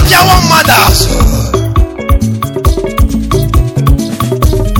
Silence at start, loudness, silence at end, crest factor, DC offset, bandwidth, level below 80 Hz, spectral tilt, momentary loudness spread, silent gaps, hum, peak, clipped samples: 0 s; -9 LUFS; 0 s; 8 dB; under 0.1%; 17.5 kHz; -12 dBFS; -4.5 dB/octave; 8 LU; none; none; 0 dBFS; 0.7%